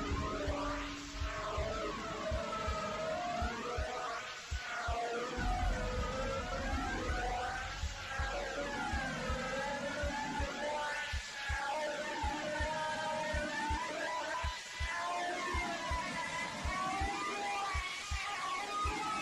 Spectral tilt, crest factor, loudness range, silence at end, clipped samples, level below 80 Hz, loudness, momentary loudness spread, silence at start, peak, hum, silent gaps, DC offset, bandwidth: -4 dB/octave; 12 dB; 1 LU; 0 s; under 0.1%; -44 dBFS; -38 LUFS; 3 LU; 0 s; -26 dBFS; none; none; under 0.1%; 15.5 kHz